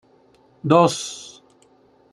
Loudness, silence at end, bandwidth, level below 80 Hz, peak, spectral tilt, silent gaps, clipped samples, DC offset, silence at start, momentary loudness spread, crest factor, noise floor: -19 LUFS; 0.85 s; 12.5 kHz; -68 dBFS; -2 dBFS; -5 dB/octave; none; under 0.1%; under 0.1%; 0.65 s; 21 LU; 22 dB; -56 dBFS